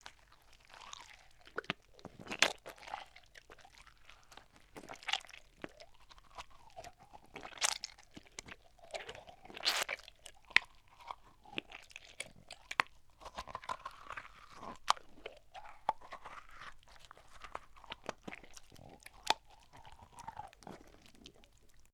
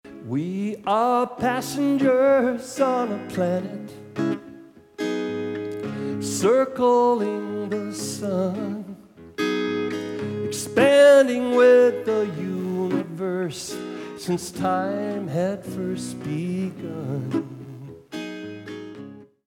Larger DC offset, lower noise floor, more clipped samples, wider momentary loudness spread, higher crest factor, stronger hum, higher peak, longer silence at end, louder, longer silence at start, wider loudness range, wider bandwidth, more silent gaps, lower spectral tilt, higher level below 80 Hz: neither; first, -63 dBFS vs -46 dBFS; neither; first, 24 LU vs 17 LU; first, 40 dB vs 20 dB; neither; about the same, -6 dBFS vs -4 dBFS; second, 0.05 s vs 0.25 s; second, -40 LUFS vs -23 LUFS; about the same, 0.05 s vs 0.05 s; about the same, 9 LU vs 10 LU; first, 19.5 kHz vs 17 kHz; neither; second, -0.5 dB/octave vs -5.5 dB/octave; about the same, -66 dBFS vs -66 dBFS